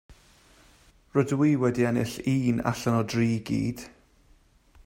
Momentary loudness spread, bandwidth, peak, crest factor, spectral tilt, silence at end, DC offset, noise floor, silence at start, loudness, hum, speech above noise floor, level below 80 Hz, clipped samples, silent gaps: 6 LU; 16 kHz; -8 dBFS; 20 dB; -7 dB/octave; 0.95 s; under 0.1%; -60 dBFS; 0.1 s; -26 LUFS; none; 35 dB; -56 dBFS; under 0.1%; none